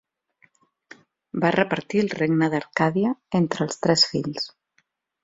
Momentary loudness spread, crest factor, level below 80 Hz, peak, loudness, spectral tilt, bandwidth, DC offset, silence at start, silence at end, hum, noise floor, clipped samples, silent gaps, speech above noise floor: 10 LU; 22 dB; -62 dBFS; -4 dBFS; -23 LUFS; -5 dB/octave; 7.8 kHz; under 0.1%; 1.35 s; 0.75 s; none; -69 dBFS; under 0.1%; none; 47 dB